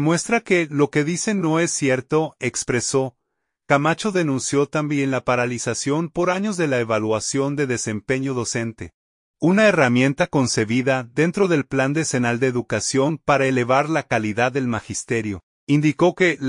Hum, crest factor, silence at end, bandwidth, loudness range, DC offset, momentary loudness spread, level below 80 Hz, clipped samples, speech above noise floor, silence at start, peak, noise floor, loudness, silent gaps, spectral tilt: none; 18 dB; 0 s; 11 kHz; 3 LU; under 0.1%; 7 LU; -56 dBFS; under 0.1%; 58 dB; 0 s; -2 dBFS; -78 dBFS; -20 LUFS; 8.94-9.34 s, 15.43-15.67 s; -5 dB/octave